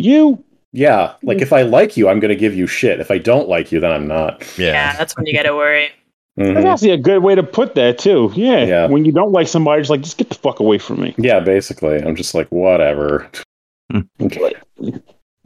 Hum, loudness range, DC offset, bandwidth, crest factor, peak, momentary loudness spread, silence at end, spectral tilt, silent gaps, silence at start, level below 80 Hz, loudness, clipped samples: none; 4 LU; under 0.1%; 14.5 kHz; 14 dB; 0 dBFS; 10 LU; 0.45 s; -5.5 dB/octave; 0.65-0.72 s, 6.13-6.29 s, 13.45-13.89 s; 0 s; -48 dBFS; -14 LUFS; under 0.1%